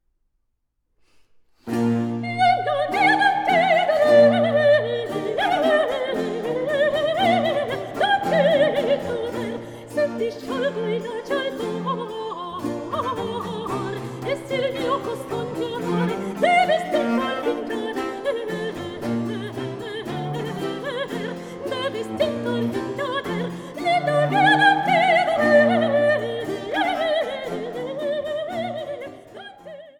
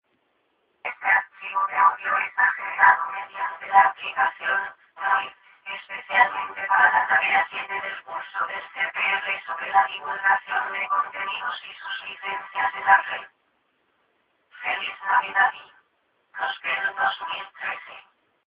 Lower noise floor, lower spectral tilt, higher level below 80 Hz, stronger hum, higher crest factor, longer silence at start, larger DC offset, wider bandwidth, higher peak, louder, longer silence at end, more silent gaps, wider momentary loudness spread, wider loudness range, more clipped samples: first, -73 dBFS vs -69 dBFS; about the same, -5.5 dB/octave vs -5 dB/octave; first, -60 dBFS vs -74 dBFS; neither; about the same, 18 dB vs 22 dB; first, 1.65 s vs 0.85 s; neither; first, 16.5 kHz vs 5.2 kHz; about the same, -4 dBFS vs -2 dBFS; about the same, -22 LUFS vs -23 LUFS; second, 0.1 s vs 0.55 s; neither; about the same, 13 LU vs 15 LU; first, 9 LU vs 5 LU; neither